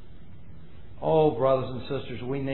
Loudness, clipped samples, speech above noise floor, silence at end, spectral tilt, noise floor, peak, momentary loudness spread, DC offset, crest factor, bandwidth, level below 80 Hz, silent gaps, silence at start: -26 LUFS; under 0.1%; 23 dB; 0 s; -11 dB/octave; -48 dBFS; -10 dBFS; 11 LU; 1%; 18 dB; 4.2 kHz; -52 dBFS; none; 0.05 s